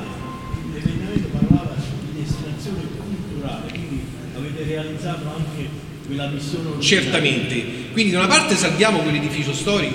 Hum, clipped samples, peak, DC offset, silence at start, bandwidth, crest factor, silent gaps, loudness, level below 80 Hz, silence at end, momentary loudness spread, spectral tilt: none; under 0.1%; 0 dBFS; under 0.1%; 0 s; 16 kHz; 22 dB; none; -21 LUFS; -40 dBFS; 0 s; 14 LU; -4.5 dB/octave